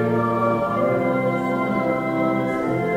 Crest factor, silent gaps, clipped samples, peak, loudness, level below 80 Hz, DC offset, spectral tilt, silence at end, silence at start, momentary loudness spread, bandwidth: 14 dB; none; under 0.1%; -8 dBFS; -21 LUFS; -54 dBFS; under 0.1%; -8 dB/octave; 0 s; 0 s; 2 LU; 16 kHz